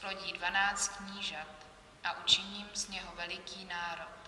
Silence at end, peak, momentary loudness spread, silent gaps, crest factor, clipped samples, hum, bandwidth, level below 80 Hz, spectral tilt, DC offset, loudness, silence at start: 0 s; -12 dBFS; 13 LU; none; 26 dB; under 0.1%; none; 12 kHz; -64 dBFS; 0 dB/octave; under 0.1%; -34 LUFS; 0 s